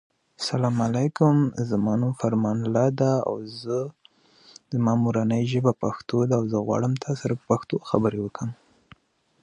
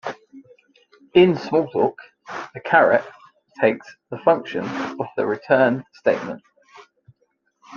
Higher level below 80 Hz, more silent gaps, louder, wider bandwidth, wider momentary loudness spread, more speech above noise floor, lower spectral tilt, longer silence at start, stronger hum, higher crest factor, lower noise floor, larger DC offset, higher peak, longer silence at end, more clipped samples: first, -60 dBFS vs -66 dBFS; neither; second, -24 LUFS vs -20 LUFS; first, 10.5 kHz vs 7 kHz; second, 9 LU vs 18 LU; second, 34 dB vs 49 dB; about the same, -7.5 dB/octave vs -7 dB/octave; first, 0.4 s vs 0.05 s; neither; about the same, 20 dB vs 20 dB; second, -58 dBFS vs -68 dBFS; neither; about the same, -4 dBFS vs -2 dBFS; first, 0.9 s vs 0 s; neither